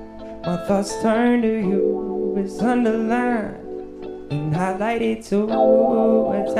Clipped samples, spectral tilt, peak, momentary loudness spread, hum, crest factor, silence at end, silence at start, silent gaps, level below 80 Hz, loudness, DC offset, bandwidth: under 0.1%; -7 dB/octave; -4 dBFS; 14 LU; none; 16 dB; 0 s; 0 s; none; -48 dBFS; -20 LUFS; under 0.1%; 12 kHz